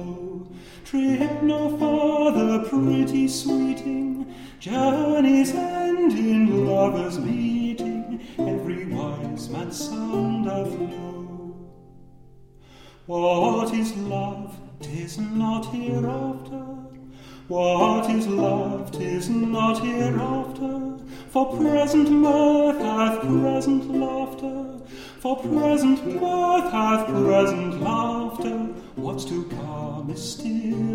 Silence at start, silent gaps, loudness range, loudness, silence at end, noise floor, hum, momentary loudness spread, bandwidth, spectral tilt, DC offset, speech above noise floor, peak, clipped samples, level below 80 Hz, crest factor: 0 s; none; 7 LU; -23 LUFS; 0 s; -48 dBFS; none; 14 LU; 16 kHz; -6.5 dB/octave; under 0.1%; 26 dB; -6 dBFS; under 0.1%; -52 dBFS; 18 dB